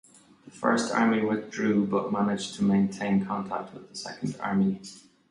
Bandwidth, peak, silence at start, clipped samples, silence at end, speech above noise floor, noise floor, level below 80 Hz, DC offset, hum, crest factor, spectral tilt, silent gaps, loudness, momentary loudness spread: 11 kHz; -8 dBFS; 0.45 s; under 0.1%; 0.3 s; 26 dB; -53 dBFS; -64 dBFS; under 0.1%; none; 20 dB; -6 dB/octave; none; -27 LUFS; 13 LU